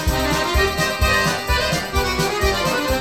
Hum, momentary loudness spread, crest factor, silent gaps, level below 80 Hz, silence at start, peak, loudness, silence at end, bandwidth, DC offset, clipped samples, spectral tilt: none; 3 LU; 14 dB; none; -26 dBFS; 0 s; -4 dBFS; -19 LUFS; 0 s; 18.5 kHz; 0.3%; under 0.1%; -4 dB/octave